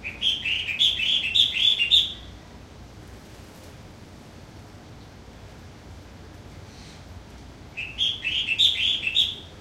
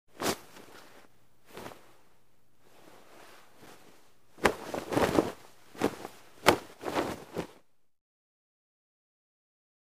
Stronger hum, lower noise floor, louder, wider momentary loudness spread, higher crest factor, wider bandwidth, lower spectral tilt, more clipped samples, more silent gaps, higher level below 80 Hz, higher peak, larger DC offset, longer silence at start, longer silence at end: neither; second, -45 dBFS vs -70 dBFS; first, -20 LUFS vs -31 LUFS; about the same, 26 LU vs 27 LU; second, 22 dB vs 36 dB; about the same, 16 kHz vs 15.5 kHz; second, -1 dB/octave vs -4 dB/octave; neither; neither; first, -50 dBFS vs -60 dBFS; second, -6 dBFS vs -2 dBFS; second, under 0.1% vs 0.2%; second, 0 s vs 0.15 s; second, 0 s vs 2.45 s